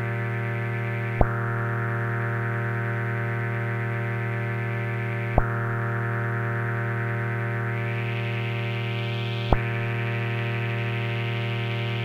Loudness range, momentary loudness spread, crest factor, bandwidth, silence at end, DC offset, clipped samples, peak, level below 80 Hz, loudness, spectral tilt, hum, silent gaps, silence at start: 1 LU; 3 LU; 26 dB; 5.2 kHz; 0 s; under 0.1%; under 0.1%; 0 dBFS; -38 dBFS; -27 LUFS; -8 dB/octave; none; none; 0 s